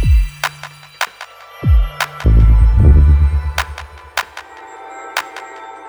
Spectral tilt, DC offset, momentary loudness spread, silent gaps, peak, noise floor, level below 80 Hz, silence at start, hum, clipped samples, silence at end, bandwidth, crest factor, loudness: -5.5 dB/octave; under 0.1%; 23 LU; none; 0 dBFS; -36 dBFS; -14 dBFS; 0 s; 50 Hz at -35 dBFS; under 0.1%; 0 s; over 20 kHz; 14 dB; -15 LUFS